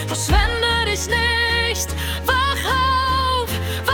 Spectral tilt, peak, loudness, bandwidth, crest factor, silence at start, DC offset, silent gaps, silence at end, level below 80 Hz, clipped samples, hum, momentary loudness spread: -3 dB/octave; -4 dBFS; -19 LUFS; 18 kHz; 14 dB; 0 s; under 0.1%; none; 0 s; -28 dBFS; under 0.1%; none; 5 LU